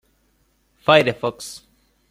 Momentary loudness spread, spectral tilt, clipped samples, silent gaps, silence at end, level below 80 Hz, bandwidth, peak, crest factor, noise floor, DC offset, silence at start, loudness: 20 LU; -4.5 dB/octave; under 0.1%; none; 0.55 s; -58 dBFS; 16 kHz; -2 dBFS; 22 dB; -64 dBFS; under 0.1%; 0.9 s; -18 LUFS